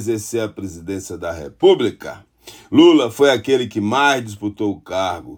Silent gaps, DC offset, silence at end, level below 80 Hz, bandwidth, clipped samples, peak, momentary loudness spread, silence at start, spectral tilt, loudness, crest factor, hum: none; under 0.1%; 0 s; -52 dBFS; 18 kHz; under 0.1%; 0 dBFS; 16 LU; 0 s; -5 dB/octave; -17 LUFS; 16 dB; none